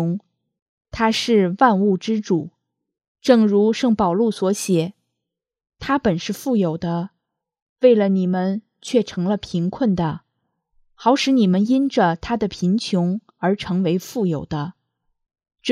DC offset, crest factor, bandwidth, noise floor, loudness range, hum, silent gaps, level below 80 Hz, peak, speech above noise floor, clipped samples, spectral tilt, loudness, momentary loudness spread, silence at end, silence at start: under 0.1%; 20 dB; 14 kHz; -83 dBFS; 4 LU; none; 0.62-0.78 s, 3.08-3.15 s, 7.62-7.76 s; -52 dBFS; 0 dBFS; 65 dB; under 0.1%; -6 dB/octave; -20 LUFS; 11 LU; 0 s; 0 s